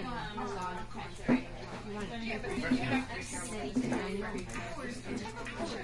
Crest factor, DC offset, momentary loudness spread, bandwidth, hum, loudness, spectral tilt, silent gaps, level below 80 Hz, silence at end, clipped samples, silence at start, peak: 20 dB; under 0.1%; 9 LU; 11.5 kHz; none; -37 LUFS; -5 dB/octave; none; -50 dBFS; 0 s; under 0.1%; 0 s; -16 dBFS